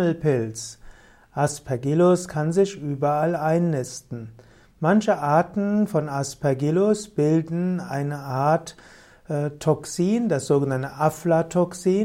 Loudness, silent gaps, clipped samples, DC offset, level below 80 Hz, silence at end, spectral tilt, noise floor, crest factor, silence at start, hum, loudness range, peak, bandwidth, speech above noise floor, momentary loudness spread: -23 LUFS; none; under 0.1%; under 0.1%; -56 dBFS; 0 s; -6.5 dB/octave; -46 dBFS; 16 dB; 0 s; none; 2 LU; -6 dBFS; 16 kHz; 24 dB; 9 LU